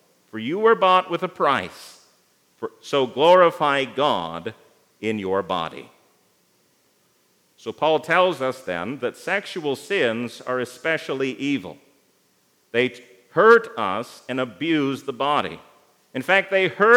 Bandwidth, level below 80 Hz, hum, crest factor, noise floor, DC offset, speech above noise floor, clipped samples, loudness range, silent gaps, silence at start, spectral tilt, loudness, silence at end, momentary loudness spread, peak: 15.5 kHz; -74 dBFS; none; 22 dB; -63 dBFS; under 0.1%; 42 dB; under 0.1%; 6 LU; none; 0.35 s; -5 dB/octave; -21 LUFS; 0 s; 18 LU; -2 dBFS